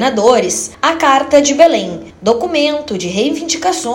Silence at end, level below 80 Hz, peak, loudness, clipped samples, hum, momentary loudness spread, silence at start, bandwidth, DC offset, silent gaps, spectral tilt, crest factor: 0 s; -48 dBFS; 0 dBFS; -13 LUFS; 0.7%; none; 9 LU; 0 s; 17 kHz; under 0.1%; none; -3 dB/octave; 12 dB